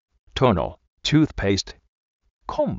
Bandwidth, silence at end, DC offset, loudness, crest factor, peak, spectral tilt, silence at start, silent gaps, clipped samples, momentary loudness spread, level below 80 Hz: 7.8 kHz; 0 s; under 0.1%; -22 LUFS; 20 dB; -4 dBFS; -5 dB/octave; 0.35 s; 0.88-0.97 s, 1.89-2.20 s, 2.30-2.41 s; under 0.1%; 14 LU; -40 dBFS